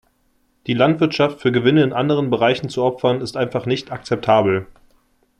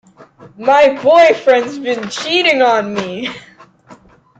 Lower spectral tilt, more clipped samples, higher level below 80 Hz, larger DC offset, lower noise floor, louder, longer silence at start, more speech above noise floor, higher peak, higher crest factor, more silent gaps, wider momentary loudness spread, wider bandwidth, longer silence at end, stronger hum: first, -7 dB/octave vs -3.5 dB/octave; neither; about the same, -56 dBFS vs -56 dBFS; neither; first, -62 dBFS vs -43 dBFS; second, -18 LUFS vs -12 LUFS; first, 0.65 s vs 0.2 s; first, 45 dB vs 31 dB; about the same, -2 dBFS vs 0 dBFS; about the same, 16 dB vs 14 dB; neither; second, 8 LU vs 14 LU; first, 11 kHz vs 8.8 kHz; first, 0.75 s vs 0.45 s; neither